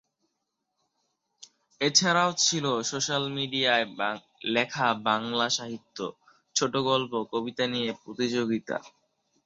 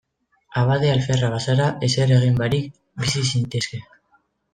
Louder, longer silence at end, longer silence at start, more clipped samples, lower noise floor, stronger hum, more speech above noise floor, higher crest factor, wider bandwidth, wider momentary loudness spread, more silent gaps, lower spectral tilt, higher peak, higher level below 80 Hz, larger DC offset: second, -27 LUFS vs -20 LUFS; second, 0.55 s vs 0.7 s; first, 1.4 s vs 0.5 s; neither; first, -81 dBFS vs -63 dBFS; neither; first, 53 dB vs 44 dB; first, 22 dB vs 16 dB; second, 8.4 kHz vs 9.6 kHz; about the same, 12 LU vs 10 LU; neither; second, -2.5 dB/octave vs -5.5 dB/octave; about the same, -6 dBFS vs -6 dBFS; second, -72 dBFS vs -50 dBFS; neither